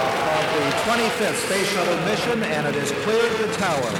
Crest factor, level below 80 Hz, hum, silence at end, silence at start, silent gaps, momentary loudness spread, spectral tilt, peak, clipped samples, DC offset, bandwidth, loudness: 12 dB; -54 dBFS; none; 0 s; 0 s; none; 2 LU; -3.5 dB/octave; -8 dBFS; under 0.1%; under 0.1%; 19 kHz; -21 LUFS